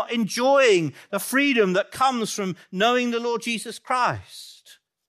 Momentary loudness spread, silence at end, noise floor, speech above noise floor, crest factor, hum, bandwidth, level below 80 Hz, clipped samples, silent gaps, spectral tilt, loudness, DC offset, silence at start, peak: 12 LU; 0.55 s; -54 dBFS; 32 dB; 16 dB; none; 15.5 kHz; -70 dBFS; under 0.1%; none; -4 dB/octave; -22 LUFS; under 0.1%; 0 s; -6 dBFS